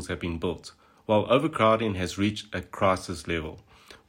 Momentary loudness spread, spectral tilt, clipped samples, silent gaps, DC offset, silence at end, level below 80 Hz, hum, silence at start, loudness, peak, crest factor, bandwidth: 15 LU; -5.5 dB/octave; under 0.1%; none; under 0.1%; 0.1 s; -50 dBFS; none; 0 s; -27 LUFS; -8 dBFS; 20 dB; 16 kHz